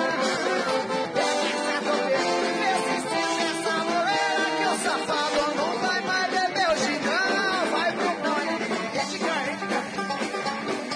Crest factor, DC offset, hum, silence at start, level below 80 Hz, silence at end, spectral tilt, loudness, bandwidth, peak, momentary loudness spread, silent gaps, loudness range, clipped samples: 14 dB; under 0.1%; none; 0 s; -64 dBFS; 0 s; -2.5 dB/octave; -25 LUFS; 10.5 kHz; -12 dBFS; 5 LU; none; 2 LU; under 0.1%